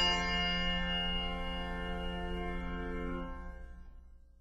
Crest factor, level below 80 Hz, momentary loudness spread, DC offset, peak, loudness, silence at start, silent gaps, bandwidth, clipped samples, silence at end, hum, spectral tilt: 18 dB; -42 dBFS; 18 LU; under 0.1%; -18 dBFS; -36 LUFS; 0 s; none; 9.8 kHz; under 0.1%; 0.2 s; 60 Hz at -45 dBFS; -4 dB/octave